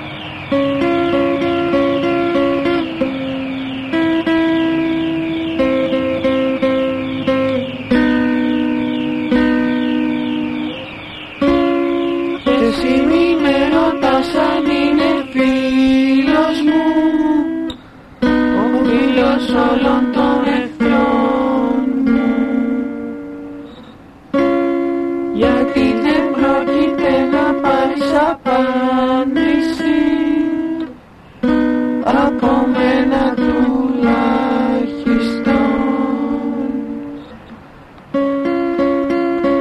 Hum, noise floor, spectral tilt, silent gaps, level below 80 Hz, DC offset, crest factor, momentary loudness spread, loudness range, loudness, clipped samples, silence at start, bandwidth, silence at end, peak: none; -40 dBFS; -6.5 dB/octave; none; -40 dBFS; under 0.1%; 14 dB; 7 LU; 4 LU; -15 LUFS; under 0.1%; 0 s; 10.5 kHz; 0 s; -2 dBFS